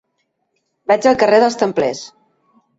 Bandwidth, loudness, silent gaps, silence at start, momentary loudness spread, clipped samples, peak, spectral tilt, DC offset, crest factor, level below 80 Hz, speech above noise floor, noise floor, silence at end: 8 kHz; -15 LUFS; none; 0.9 s; 18 LU; under 0.1%; -2 dBFS; -4.5 dB/octave; under 0.1%; 16 dB; -58 dBFS; 56 dB; -70 dBFS; 0.7 s